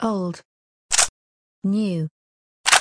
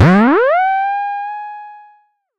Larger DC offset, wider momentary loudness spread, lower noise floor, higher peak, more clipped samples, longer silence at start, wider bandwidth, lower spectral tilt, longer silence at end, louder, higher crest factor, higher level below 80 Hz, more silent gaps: neither; second, 13 LU vs 19 LU; first, under -90 dBFS vs -52 dBFS; about the same, 0 dBFS vs -2 dBFS; neither; about the same, 0 s vs 0 s; first, 10.5 kHz vs 8.4 kHz; second, -2.5 dB/octave vs -8.5 dB/octave; second, 0 s vs 0.6 s; second, -22 LUFS vs -14 LUFS; first, 24 dB vs 12 dB; second, -58 dBFS vs -46 dBFS; first, 0.45-0.89 s, 1.09-1.62 s, 2.11-2.64 s vs none